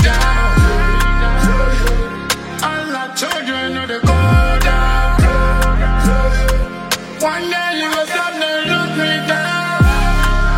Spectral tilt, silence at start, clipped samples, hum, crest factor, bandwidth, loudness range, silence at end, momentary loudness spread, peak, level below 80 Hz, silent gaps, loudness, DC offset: -5 dB/octave; 0 s; under 0.1%; none; 14 dB; 16.5 kHz; 2 LU; 0 s; 6 LU; 0 dBFS; -16 dBFS; none; -16 LUFS; under 0.1%